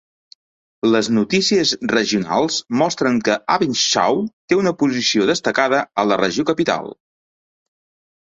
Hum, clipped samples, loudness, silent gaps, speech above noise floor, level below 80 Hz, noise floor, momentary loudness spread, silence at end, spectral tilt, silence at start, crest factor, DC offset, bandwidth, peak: none; under 0.1%; -18 LUFS; 4.33-4.48 s; over 72 dB; -58 dBFS; under -90 dBFS; 4 LU; 1.35 s; -3.5 dB/octave; 0.85 s; 18 dB; under 0.1%; 8.2 kHz; -2 dBFS